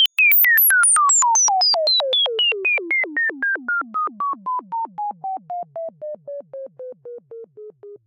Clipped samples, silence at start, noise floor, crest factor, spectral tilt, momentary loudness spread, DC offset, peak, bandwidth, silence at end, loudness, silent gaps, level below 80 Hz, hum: under 0.1%; 0 s; -40 dBFS; 14 dB; 2 dB/octave; 22 LU; under 0.1%; -4 dBFS; 16 kHz; 0.1 s; -16 LUFS; none; -86 dBFS; none